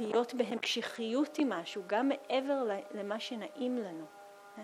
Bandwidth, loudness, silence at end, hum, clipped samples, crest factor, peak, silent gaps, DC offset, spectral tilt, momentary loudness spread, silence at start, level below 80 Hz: 14.5 kHz; -35 LUFS; 0 s; none; under 0.1%; 18 dB; -16 dBFS; none; under 0.1%; -4 dB/octave; 11 LU; 0 s; under -90 dBFS